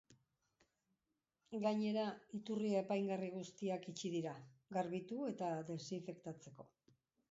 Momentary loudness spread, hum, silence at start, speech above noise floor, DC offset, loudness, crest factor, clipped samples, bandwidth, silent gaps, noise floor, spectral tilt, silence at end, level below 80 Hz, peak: 13 LU; none; 0.1 s; 47 dB; under 0.1%; -43 LUFS; 18 dB; under 0.1%; 7.6 kHz; none; -89 dBFS; -6 dB/octave; 0.65 s; -86 dBFS; -26 dBFS